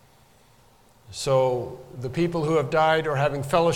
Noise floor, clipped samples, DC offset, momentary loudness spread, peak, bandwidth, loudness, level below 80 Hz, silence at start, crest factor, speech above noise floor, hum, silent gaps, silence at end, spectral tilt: -57 dBFS; under 0.1%; under 0.1%; 13 LU; -6 dBFS; 17 kHz; -23 LUFS; -52 dBFS; 1.1 s; 18 dB; 34 dB; none; none; 0 s; -5.5 dB/octave